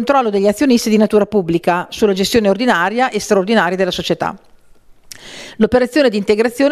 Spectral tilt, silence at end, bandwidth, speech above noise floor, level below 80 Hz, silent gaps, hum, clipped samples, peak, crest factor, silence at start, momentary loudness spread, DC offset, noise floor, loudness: -5 dB/octave; 0 s; 14.5 kHz; 30 dB; -44 dBFS; none; none; under 0.1%; 0 dBFS; 14 dB; 0 s; 6 LU; under 0.1%; -44 dBFS; -14 LUFS